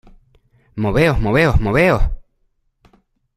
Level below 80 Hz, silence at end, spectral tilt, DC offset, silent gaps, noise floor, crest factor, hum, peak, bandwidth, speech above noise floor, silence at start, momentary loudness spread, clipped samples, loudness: -26 dBFS; 1.2 s; -7 dB/octave; under 0.1%; none; -64 dBFS; 16 dB; none; -2 dBFS; 14.5 kHz; 50 dB; 0.75 s; 14 LU; under 0.1%; -16 LUFS